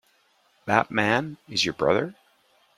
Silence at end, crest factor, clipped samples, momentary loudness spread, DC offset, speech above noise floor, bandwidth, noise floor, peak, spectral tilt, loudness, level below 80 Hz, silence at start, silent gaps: 0.65 s; 24 dB; under 0.1%; 9 LU; under 0.1%; 40 dB; 15 kHz; -64 dBFS; -2 dBFS; -4 dB/octave; -24 LUFS; -60 dBFS; 0.65 s; none